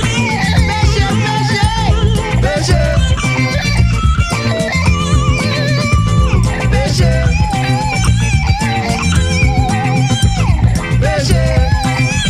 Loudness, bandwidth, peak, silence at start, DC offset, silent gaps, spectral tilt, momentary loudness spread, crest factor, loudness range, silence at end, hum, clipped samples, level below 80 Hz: -13 LUFS; 13.5 kHz; 0 dBFS; 0 s; under 0.1%; none; -5.5 dB/octave; 2 LU; 12 dB; 0 LU; 0 s; none; under 0.1%; -18 dBFS